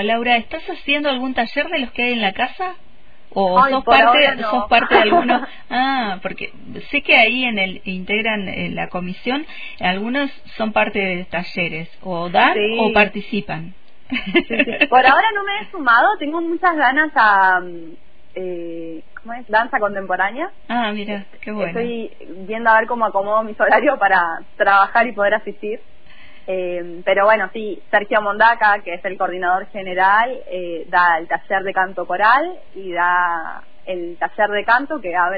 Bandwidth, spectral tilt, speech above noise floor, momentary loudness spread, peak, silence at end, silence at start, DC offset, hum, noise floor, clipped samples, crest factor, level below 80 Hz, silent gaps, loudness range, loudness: 5 kHz; -7 dB/octave; 28 dB; 16 LU; 0 dBFS; 0 s; 0 s; 2%; none; -46 dBFS; under 0.1%; 18 dB; -50 dBFS; none; 7 LU; -17 LUFS